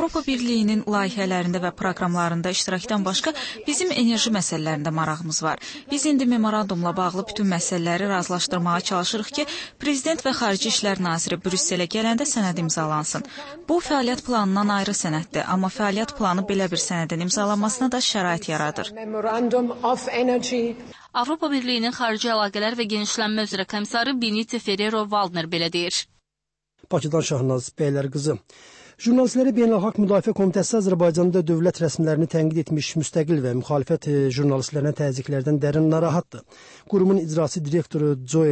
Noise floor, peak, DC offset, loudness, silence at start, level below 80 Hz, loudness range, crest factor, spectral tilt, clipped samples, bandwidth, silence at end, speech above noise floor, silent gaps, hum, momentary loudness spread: -84 dBFS; -8 dBFS; under 0.1%; -23 LUFS; 0 s; -58 dBFS; 3 LU; 14 dB; -4.5 dB/octave; under 0.1%; 8.8 kHz; 0 s; 62 dB; none; none; 6 LU